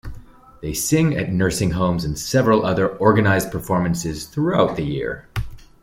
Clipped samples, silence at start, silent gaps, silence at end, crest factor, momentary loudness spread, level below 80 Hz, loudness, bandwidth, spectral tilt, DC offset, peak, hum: under 0.1%; 0.05 s; none; 0.25 s; 18 dB; 12 LU; -40 dBFS; -20 LUFS; 16.5 kHz; -5.5 dB/octave; under 0.1%; -2 dBFS; none